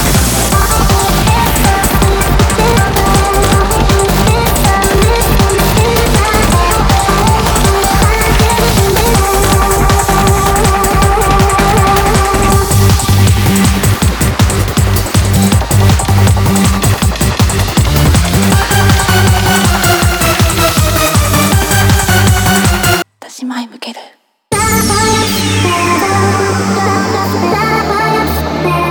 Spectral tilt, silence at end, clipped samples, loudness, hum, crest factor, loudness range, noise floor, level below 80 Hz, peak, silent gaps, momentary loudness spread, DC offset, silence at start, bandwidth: -4.5 dB/octave; 0 s; under 0.1%; -10 LUFS; none; 10 dB; 3 LU; -40 dBFS; -18 dBFS; 0 dBFS; none; 3 LU; under 0.1%; 0 s; over 20 kHz